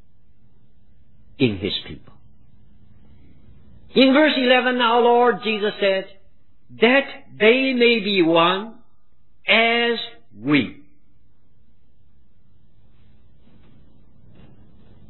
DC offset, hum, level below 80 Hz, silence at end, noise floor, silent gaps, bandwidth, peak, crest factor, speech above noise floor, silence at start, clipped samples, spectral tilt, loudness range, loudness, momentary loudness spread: 0.9%; none; -58 dBFS; 4.35 s; -63 dBFS; none; 4.3 kHz; -2 dBFS; 20 dB; 45 dB; 1.4 s; under 0.1%; -8 dB/octave; 11 LU; -18 LUFS; 15 LU